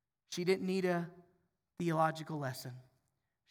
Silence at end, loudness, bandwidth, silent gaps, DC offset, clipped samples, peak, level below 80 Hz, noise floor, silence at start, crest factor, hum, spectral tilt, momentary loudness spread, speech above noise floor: 0.7 s; -36 LUFS; over 20 kHz; none; under 0.1%; under 0.1%; -20 dBFS; -82 dBFS; -83 dBFS; 0.3 s; 18 dB; none; -6 dB/octave; 14 LU; 48 dB